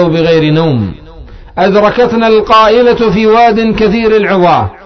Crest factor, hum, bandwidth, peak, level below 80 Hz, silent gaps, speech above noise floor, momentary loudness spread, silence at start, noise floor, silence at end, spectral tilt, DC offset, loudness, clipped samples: 8 dB; none; 6.4 kHz; 0 dBFS; -32 dBFS; none; 22 dB; 6 LU; 0 s; -30 dBFS; 0.1 s; -7 dB/octave; under 0.1%; -8 LUFS; 0.3%